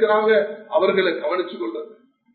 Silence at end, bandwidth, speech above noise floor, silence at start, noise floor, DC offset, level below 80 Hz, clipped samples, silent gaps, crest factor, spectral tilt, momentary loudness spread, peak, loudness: 0.4 s; 4.5 kHz; 28 dB; 0 s; -47 dBFS; under 0.1%; -78 dBFS; under 0.1%; none; 16 dB; -9.5 dB/octave; 14 LU; -4 dBFS; -21 LUFS